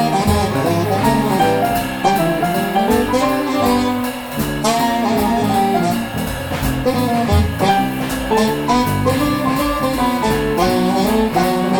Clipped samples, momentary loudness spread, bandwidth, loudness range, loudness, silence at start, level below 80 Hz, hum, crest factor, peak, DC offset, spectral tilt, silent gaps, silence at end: under 0.1%; 4 LU; over 20 kHz; 1 LU; -16 LUFS; 0 s; -34 dBFS; none; 14 dB; -2 dBFS; under 0.1%; -5.5 dB/octave; none; 0 s